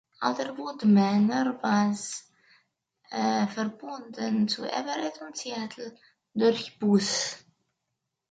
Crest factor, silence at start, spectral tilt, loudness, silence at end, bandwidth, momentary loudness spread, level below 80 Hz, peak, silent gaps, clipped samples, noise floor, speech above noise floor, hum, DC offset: 18 dB; 0.2 s; -5 dB/octave; -27 LUFS; 0.9 s; 9.2 kHz; 15 LU; -74 dBFS; -10 dBFS; none; under 0.1%; -83 dBFS; 56 dB; none; under 0.1%